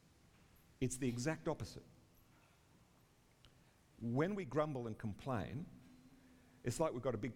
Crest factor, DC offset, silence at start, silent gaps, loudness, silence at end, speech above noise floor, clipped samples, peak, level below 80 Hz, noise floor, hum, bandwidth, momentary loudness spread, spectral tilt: 22 dB; under 0.1%; 0.8 s; none; -42 LUFS; 0 s; 29 dB; under 0.1%; -22 dBFS; -66 dBFS; -70 dBFS; none; 17 kHz; 13 LU; -6 dB/octave